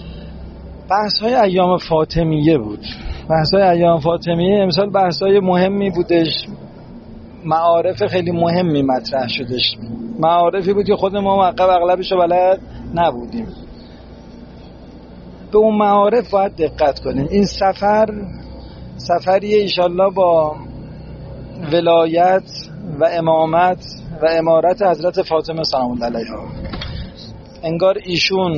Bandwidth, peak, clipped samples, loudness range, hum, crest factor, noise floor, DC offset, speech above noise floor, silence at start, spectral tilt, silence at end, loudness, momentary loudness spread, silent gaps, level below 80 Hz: 7.2 kHz; -2 dBFS; under 0.1%; 4 LU; none; 14 dB; -37 dBFS; under 0.1%; 22 dB; 0 s; -4.5 dB/octave; 0 s; -16 LUFS; 18 LU; none; -38 dBFS